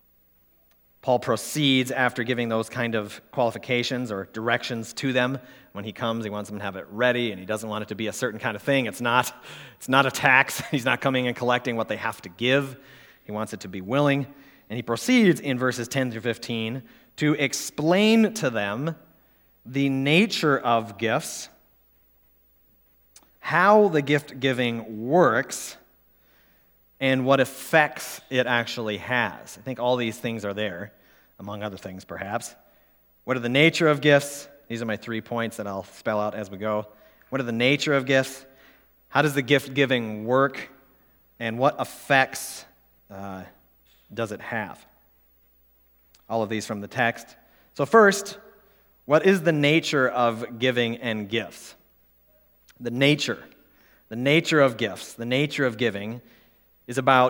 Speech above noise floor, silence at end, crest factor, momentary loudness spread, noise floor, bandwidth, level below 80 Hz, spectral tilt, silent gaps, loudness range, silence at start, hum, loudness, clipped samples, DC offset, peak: 37 dB; 0 s; 24 dB; 17 LU; -61 dBFS; over 20 kHz; -68 dBFS; -4.5 dB/octave; none; 6 LU; 1.05 s; none; -24 LUFS; under 0.1%; under 0.1%; -2 dBFS